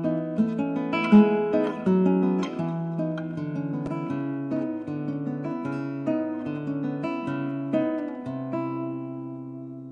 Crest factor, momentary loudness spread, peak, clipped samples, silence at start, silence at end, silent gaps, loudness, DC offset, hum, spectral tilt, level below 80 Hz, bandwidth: 18 dB; 11 LU; -8 dBFS; under 0.1%; 0 s; 0 s; none; -26 LUFS; under 0.1%; none; -9 dB/octave; -66 dBFS; 7 kHz